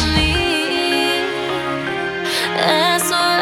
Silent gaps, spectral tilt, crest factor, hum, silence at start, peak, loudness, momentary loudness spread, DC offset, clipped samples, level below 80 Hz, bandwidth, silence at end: none; -3.5 dB/octave; 16 dB; none; 0 s; -2 dBFS; -17 LUFS; 7 LU; under 0.1%; under 0.1%; -32 dBFS; 16.5 kHz; 0 s